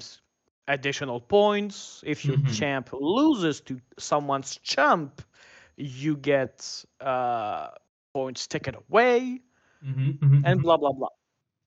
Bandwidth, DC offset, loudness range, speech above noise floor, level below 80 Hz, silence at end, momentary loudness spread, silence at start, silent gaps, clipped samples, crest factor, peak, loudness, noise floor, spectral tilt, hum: 8 kHz; under 0.1%; 5 LU; 30 dB; -64 dBFS; 0.55 s; 16 LU; 0 s; 0.51-0.62 s, 7.89-8.15 s; under 0.1%; 20 dB; -6 dBFS; -25 LUFS; -55 dBFS; -6 dB/octave; none